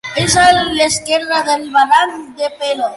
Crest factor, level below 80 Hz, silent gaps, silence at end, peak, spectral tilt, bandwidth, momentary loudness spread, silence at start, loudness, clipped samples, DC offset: 14 dB; -42 dBFS; none; 0 s; 0 dBFS; -2.5 dB/octave; 11.5 kHz; 10 LU; 0.05 s; -13 LUFS; under 0.1%; under 0.1%